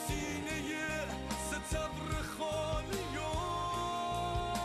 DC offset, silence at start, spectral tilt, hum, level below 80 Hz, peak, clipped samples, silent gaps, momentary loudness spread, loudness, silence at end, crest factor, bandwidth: under 0.1%; 0 s; -4 dB/octave; none; -46 dBFS; -24 dBFS; under 0.1%; none; 2 LU; -37 LUFS; 0 s; 12 dB; 13.5 kHz